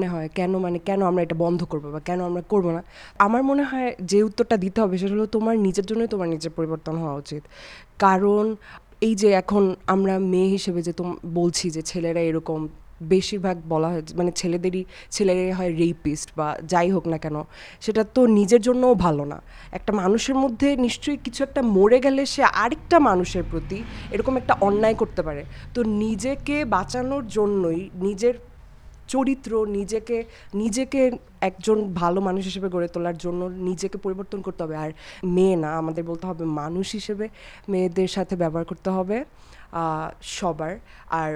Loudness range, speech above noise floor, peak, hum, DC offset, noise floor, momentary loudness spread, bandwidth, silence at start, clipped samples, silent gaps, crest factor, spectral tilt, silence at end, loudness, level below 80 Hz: 6 LU; 22 dB; 0 dBFS; none; under 0.1%; -45 dBFS; 12 LU; 12 kHz; 0 s; under 0.1%; none; 22 dB; -6 dB/octave; 0 s; -23 LUFS; -46 dBFS